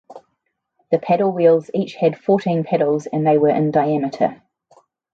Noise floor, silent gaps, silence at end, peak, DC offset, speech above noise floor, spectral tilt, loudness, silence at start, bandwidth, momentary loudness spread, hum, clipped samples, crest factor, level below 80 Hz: -73 dBFS; none; 0.8 s; -2 dBFS; under 0.1%; 56 dB; -8.5 dB/octave; -18 LUFS; 0.1 s; 7.6 kHz; 7 LU; none; under 0.1%; 16 dB; -66 dBFS